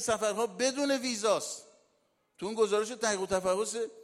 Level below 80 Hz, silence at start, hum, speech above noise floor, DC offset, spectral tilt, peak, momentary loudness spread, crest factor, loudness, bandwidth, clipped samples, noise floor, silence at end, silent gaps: -66 dBFS; 0 s; none; 43 dB; under 0.1%; -2.5 dB/octave; -14 dBFS; 9 LU; 16 dB; -30 LUFS; 15.5 kHz; under 0.1%; -73 dBFS; 0 s; none